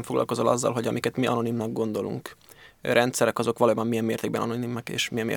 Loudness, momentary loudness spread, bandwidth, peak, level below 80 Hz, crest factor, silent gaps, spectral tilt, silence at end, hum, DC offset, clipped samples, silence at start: -26 LUFS; 8 LU; 19 kHz; -4 dBFS; -64 dBFS; 22 dB; none; -5 dB/octave; 0 s; none; under 0.1%; under 0.1%; 0 s